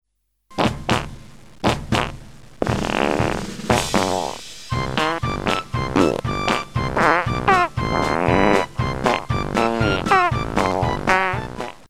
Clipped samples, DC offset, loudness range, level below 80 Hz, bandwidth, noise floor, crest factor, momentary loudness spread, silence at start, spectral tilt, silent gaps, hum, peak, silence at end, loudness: under 0.1%; 0.8%; 4 LU; -36 dBFS; 15.5 kHz; -56 dBFS; 20 dB; 9 LU; 0 s; -5 dB/octave; none; none; 0 dBFS; 0 s; -20 LUFS